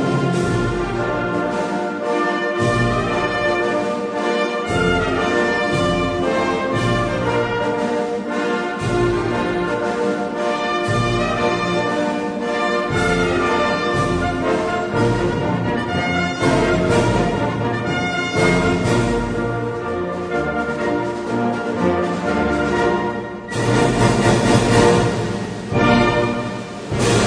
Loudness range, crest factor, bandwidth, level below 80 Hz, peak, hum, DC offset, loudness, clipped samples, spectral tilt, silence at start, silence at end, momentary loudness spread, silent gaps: 3 LU; 18 dB; 10.5 kHz; -36 dBFS; 0 dBFS; none; under 0.1%; -19 LUFS; under 0.1%; -5.5 dB/octave; 0 s; 0 s; 6 LU; none